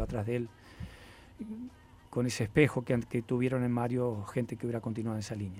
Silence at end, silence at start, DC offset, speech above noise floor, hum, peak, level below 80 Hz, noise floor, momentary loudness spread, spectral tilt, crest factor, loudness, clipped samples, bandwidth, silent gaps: 0 s; 0 s; under 0.1%; 21 dB; none; -10 dBFS; -54 dBFS; -53 dBFS; 20 LU; -6.5 dB/octave; 22 dB; -33 LUFS; under 0.1%; 15.5 kHz; none